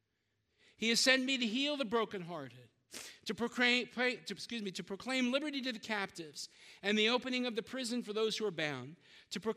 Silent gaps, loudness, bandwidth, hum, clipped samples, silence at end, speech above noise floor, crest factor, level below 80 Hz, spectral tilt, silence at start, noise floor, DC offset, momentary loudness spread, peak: none; -35 LUFS; 15.5 kHz; none; under 0.1%; 0 s; 46 dB; 22 dB; -80 dBFS; -2.5 dB/octave; 0.8 s; -82 dBFS; under 0.1%; 16 LU; -14 dBFS